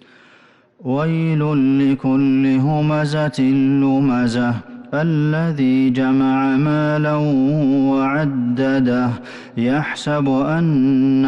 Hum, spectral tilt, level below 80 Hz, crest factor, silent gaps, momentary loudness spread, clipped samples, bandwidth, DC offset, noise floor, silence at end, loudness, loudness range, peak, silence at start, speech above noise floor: none; -8 dB/octave; -52 dBFS; 8 dB; none; 5 LU; under 0.1%; 9 kHz; under 0.1%; -51 dBFS; 0 s; -17 LUFS; 2 LU; -10 dBFS; 0.8 s; 34 dB